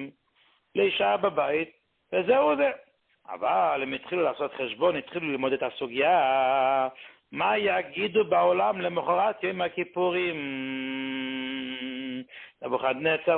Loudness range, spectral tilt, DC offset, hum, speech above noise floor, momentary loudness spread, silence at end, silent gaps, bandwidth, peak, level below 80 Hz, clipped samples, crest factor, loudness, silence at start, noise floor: 5 LU; -9 dB/octave; under 0.1%; none; 40 dB; 11 LU; 0 s; none; 4.4 kHz; -10 dBFS; -68 dBFS; under 0.1%; 16 dB; -27 LUFS; 0 s; -66 dBFS